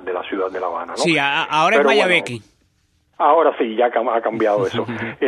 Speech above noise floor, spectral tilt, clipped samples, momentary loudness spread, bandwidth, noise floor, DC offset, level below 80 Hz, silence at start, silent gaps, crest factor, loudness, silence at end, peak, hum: 44 dB; -4.5 dB/octave; under 0.1%; 11 LU; 11.5 kHz; -62 dBFS; under 0.1%; -64 dBFS; 0 s; none; 16 dB; -17 LUFS; 0 s; -2 dBFS; none